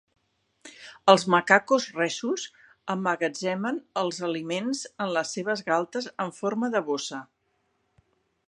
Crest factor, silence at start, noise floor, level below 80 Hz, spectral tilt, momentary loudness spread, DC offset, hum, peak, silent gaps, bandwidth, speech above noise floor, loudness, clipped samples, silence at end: 26 dB; 0.65 s; -73 dBFS; -76 dBFS; -4 dB/octave; 13 LU; under 0.1%; none; -2 dBFS; none; 11 kHz; 47 dB; -26 LUFS; under 0.1%; 1.25 s